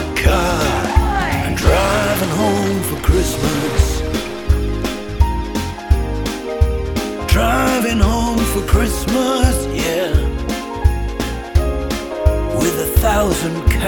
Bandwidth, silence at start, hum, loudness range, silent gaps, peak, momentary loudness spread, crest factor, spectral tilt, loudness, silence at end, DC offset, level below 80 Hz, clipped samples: 19 kHz; 0 s; none; 3 LU; none; 0 dBFS; 7 LU; 16 dB; -5 dB/octave; -17 LUFS; 0 s; under 0.1%; -20 dBFS; under 0.1%